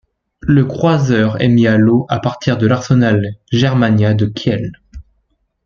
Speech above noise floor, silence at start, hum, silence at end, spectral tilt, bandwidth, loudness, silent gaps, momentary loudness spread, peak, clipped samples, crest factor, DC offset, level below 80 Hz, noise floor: 51 dB; 0.45 s; none; 0.65 s; -7.5 dB/octave; 7.2 kHz; -14 LUFS; none; 7 LU; -2 dBFS; under 0.1%; 12 dB; under 0.1%; -42 dBFS; -64 dBFS